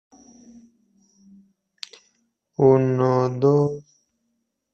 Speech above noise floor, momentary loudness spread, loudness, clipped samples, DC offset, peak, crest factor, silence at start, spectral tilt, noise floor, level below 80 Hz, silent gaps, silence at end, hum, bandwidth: 57 dB; 22 LU; -19 LUFS; under 0.1%; under 0.1%; -4 dBFS; 20 dB; 2.6 s; -8.5 dB/octave; -75 dBFS; -62 dBFS; none; 0.95 s; none; 8 kHz